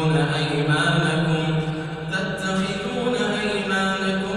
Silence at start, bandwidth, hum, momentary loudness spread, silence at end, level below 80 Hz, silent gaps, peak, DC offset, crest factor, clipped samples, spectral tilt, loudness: 0 s; 11 kHz; none; 6 LU; 0 s; -50 dBFS; none; -8 dBFS; under 0.1%; 14 dB; under 0.1%; -5.5 dB/octave; -22 LUFS